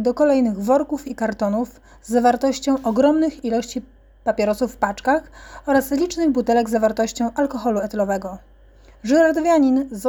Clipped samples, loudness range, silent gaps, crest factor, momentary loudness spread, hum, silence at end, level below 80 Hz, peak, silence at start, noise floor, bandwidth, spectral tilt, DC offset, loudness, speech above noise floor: under 0.1%; 1 LU; none; 16 dB; 10 LU; none; 0 s; -48 dBFS; -4 dBFS; 0 s; -48 dBFS; 20 kHz; -5 dB/octave; under 0.1%; -20 LUFS; 29 dB